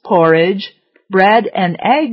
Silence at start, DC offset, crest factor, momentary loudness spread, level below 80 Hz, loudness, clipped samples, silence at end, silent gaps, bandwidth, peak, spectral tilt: 0.05 s; under 0.1%; 12 dB; 9 LU; -62 dBFS; -13 LUFS; under 0.1%; 0 s; none; 5.8 kHz; 0 dBFS; -8.5 dB/octave